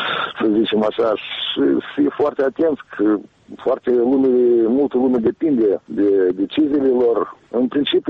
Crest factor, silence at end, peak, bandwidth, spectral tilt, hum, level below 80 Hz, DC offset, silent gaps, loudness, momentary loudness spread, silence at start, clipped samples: 10 dB; 0 s; -8 dBFS; 5.2 kHz; -7.5 dB/octave; none; -58 dBFS; under 0.1%; none; -18 LUFS; 6 LU; 0 s; under 0.1%